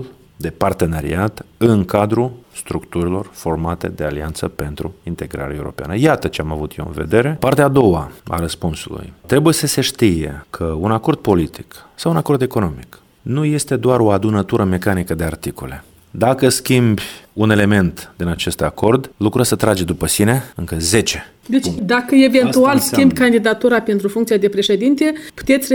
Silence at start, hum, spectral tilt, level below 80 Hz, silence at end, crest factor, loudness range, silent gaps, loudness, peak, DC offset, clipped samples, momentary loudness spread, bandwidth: 0 s; none; -5.5 dB/octave; -38 dBFS; 0 s; 16 dB; 7 LU; none; -16 LUFS; 0 dBFS; under 0.1%; under 0.1%; 13 LU; over 20 kHz